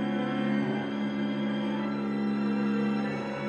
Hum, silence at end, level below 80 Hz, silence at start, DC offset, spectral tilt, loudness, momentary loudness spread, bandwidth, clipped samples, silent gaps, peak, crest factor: none; 0 s; -64 dBFS; 0 s; under 0.1%; -7.5 dB/octave; -30 LUFS; 3 LU; 7.2 kHz; under 0.1%; none; -18 dBFS; 12 dB